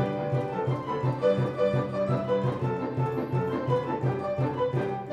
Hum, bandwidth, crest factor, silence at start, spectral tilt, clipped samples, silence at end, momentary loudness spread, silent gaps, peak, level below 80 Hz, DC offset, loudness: none; 7.4 kHz; 14 dB; 0 s; -9 dB/octave; under 0.1%; 0 s; 4 LU; none; -12 dBFS; -58 dBFS; under 0.1%; -28 LUFS